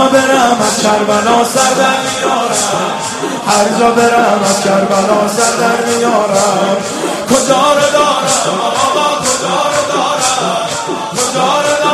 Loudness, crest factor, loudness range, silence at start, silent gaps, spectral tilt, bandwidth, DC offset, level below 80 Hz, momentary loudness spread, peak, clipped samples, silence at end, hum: -11 LUFS; 12 dB; 2 LU; 0 s; none; -2.5 dB/octave; 14 kHz; under 0.1%; -50 dBFS; 6 LU; 0 dBFS; under 0.1%; 0 s; none